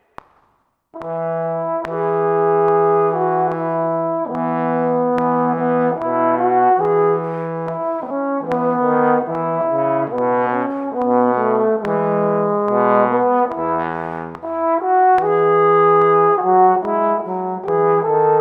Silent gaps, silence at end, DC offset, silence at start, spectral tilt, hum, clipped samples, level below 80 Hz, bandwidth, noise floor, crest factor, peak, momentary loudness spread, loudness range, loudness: none; 0 s; under 0.1%; 0.95 s; -9.5 dB/octave; none; under 0.1%; -60 dBFS; 4.5 kHz; -62 dBFS; 16 dB; -2 dBFS; 9 LU; 4 LU; -17 LUFS